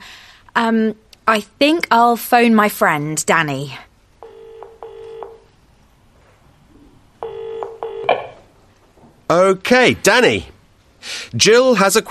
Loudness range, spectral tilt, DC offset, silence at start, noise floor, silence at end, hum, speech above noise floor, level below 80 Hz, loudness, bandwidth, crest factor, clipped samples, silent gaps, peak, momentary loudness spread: 19 LU; -3.5 dB/octave; under 0.1%; 0 s; -52 dBFS; 0 s; none; 37 dB; -52 dBFS; -15 LUFS; 13.5 kHz; 18 dB; under 0.1%; none; 0 dBFS; 23 LU